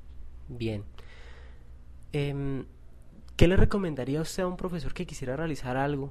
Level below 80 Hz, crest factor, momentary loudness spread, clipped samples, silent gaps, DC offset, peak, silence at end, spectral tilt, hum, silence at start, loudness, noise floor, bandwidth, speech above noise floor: -38 dBFS; 24 dB; 25 LU; under 0.1%; none; 0.3%; -4 dBFS; 0 s; -6.5 dB/octave; 60 Hz at -55 dBFS; 0 s; -30 LUFS; -49 dBFS; 13.5 kHz; 22 dB